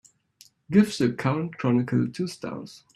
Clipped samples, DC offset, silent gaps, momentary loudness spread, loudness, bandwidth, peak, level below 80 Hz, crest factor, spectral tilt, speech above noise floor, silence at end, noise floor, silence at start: under 0.1%; under 0.1%; none; 13 LU; -25 LUFS; 13 kHz; -6 dBFS; -64 dBFS; 18 dB; -7 dB/octave; 33 dB; 0.2 s; -58 dBFS; 0.7 s